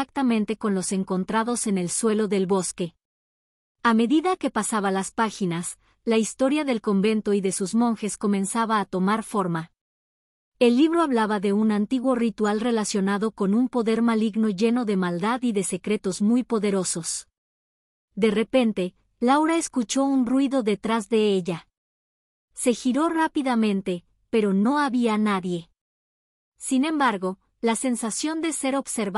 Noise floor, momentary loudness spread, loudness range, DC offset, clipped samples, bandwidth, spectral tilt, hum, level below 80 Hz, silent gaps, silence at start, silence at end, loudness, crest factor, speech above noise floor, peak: under -90 dBFS; 6 LU; 3 LU; under 0.1%; under 0.1%; 13.5 kHz; -5 dB/octave; none; -62 dBFS; 3.05-3.75 s, 9.81-10.52 s, 17.38-18.08 s, 21.77-22.48 s, 25.81-26.52 s; 0 s; 0 s; -24 LUFS; 16 dB; over 67 dB; -8 dBFS